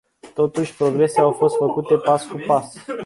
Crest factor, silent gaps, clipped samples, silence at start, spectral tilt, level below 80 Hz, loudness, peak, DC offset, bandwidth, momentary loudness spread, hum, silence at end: 16 dB; none; under 0.1%; 0.25 s; -6.5 dB/octave; -64 dBFS; -19 LUFS; -2 dBFS; under 0.1%; 11.5 kHz; 5 LU; none; 0 s